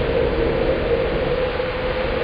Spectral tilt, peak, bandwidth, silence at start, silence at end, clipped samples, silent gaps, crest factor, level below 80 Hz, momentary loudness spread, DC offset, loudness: -8.5 dB/octave; -8 dBFS; 5.2 kHz; 0 s; 0 s; under 0.1%; none; 12 dB; -30 dBFS; 3 LU; under 0.1%; -21 LUFS